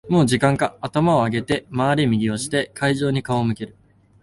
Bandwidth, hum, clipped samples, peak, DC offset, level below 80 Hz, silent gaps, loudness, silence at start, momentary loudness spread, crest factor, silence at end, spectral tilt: 11.5 kHz; none; under 0.1%; -4 dBFS; under 0.1%; -50 dBFS; none; -20 LUFS; 0.05 s; 6 LU; 16 dB; 0.5 s; -6 dB/octave